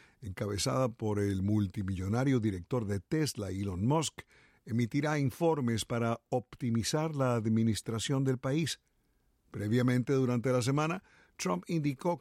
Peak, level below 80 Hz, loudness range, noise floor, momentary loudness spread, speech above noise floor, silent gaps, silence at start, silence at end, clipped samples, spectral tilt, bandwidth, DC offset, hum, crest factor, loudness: -18 dBFS; -62 dBFS; 1 LU; -73 dBFS; 7 LU; 41 dB; none; 0.2 s; 0 s; under 0.1%; -6 dB/octave; 15.5 kHz; under 0.1%; none; 14 dB; -32 LUFS